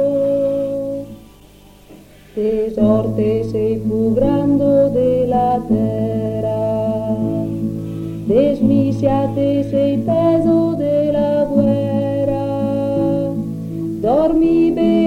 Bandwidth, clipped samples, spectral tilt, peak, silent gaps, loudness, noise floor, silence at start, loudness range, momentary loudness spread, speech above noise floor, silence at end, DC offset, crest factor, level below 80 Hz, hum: 15.5 kHz; under 0.1%; -9.5 dB/octave; -2 dBFS; none; -17 LUFS; -44 dBFS; 0 s; 4 LU; 8 LU; 29 dB; 0 s; under 0.1%; 14 dB; -40 dBFS; none